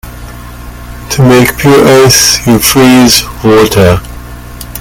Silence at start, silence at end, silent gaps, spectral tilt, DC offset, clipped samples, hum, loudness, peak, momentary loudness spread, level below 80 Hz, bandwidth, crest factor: 0.05 s; 0 s; none; -4 dB/octave; under 0.1%; 3%; 60 Hz at -25 dBFS; -5 LUFS; 0 dBFS; 23 LU; -26 dBFS; over 20 kHz; 6 dB